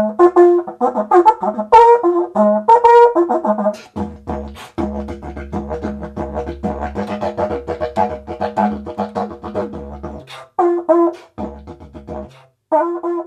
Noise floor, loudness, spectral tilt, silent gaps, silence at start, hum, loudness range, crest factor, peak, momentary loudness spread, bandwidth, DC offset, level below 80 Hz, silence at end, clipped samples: -39 dBFS; -15 LUFS; -7.5 dB/octave; none; 0 s; none; 12 LU; 16 dB; 0 dBFS; 20 LU; 9 kHz; under 0.1%; -38 dBFS; 0 s; under 0.1%